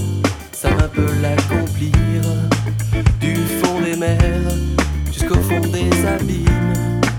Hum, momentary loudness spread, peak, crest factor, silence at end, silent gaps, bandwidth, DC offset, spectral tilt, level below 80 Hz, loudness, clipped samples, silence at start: none; 3 LU; 0 dBFS; 16 dB; 0 s; none; 19 kHz; under 0.1%; -6 dB/octave; -24 dBFS; -18 LUFS; under 0.1%; 0 s